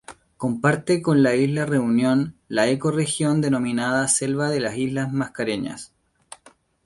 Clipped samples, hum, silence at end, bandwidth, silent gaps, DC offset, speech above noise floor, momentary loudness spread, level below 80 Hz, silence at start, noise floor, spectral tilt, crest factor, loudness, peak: under 0.1%; none; 1 s; 11.5 kHz; none; under 0.1%; 34 dB; 7 LU; -58 dBFS; 0.1 s; -55 dBFS; -5 dB/octave; 18 dB; -22 LUFS; -4 dBFS